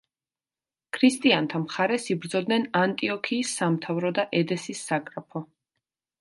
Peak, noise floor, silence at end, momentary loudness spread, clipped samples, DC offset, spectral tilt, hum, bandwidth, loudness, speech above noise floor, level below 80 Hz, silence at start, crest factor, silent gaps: -6 dBFS; under -90 dBFS; 0.75 s; 11 LU; under 0.1%; under 0.1%; -4.5 dB/octave; none; 11.5 kHz; -25 LUFS; over 65 dB; -74 dBFS; 0.95 s; 20 dB; none